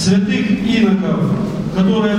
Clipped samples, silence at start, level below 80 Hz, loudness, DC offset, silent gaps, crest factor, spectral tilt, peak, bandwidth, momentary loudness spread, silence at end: under 0.1%; 0 s; -40 dBFS; -15 LUFS; under 0.1%; none; 12 dB; -6.5 dB/octave; -2 dBFS; 10.5 kHz; 4 LU; 0 s